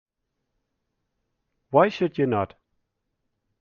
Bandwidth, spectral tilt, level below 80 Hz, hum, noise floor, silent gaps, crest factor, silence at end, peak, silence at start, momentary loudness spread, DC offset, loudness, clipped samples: 7 kHz; -5.5 dB/octave; -68 dBFS; none; -79 dBFS; none; 24 dB; 1.15 s; -4 dBFS; 1.7 s; 7 LU; under 0.1%; -23 LUFS; under 0.1%